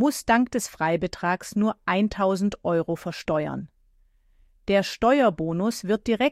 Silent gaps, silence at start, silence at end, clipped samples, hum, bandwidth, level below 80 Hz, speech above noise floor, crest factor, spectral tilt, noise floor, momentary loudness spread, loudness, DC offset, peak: none; 0 s; 0 s; under 0.1%; none; 15.5 kHz; -52 dBFS; 37 dB; 16 dB; -5.5 dB/octave; -61 dBFS; 8 LU; -24 LUFS; under 0.1%; -8 dBFS